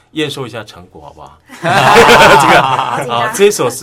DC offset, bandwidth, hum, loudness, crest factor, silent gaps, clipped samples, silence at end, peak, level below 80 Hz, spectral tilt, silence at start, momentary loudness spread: under 0.1%; over 20 kHz; none; -8 LUFS; 10 dB; none; 2%; 0 s; 0 dBFS; -38 dBFS; -3.5 dB/octave; 0.15 s; 17 LU